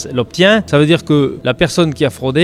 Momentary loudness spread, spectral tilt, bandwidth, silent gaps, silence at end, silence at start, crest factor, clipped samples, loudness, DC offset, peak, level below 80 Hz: 6 LU; -5.5 dB/octave; 14.5 kHz; none; 0 s; 0 s; 12 dB; under 0.1%; -13 LUFS; under 0.1%; 0 dBFS; -40 dBFS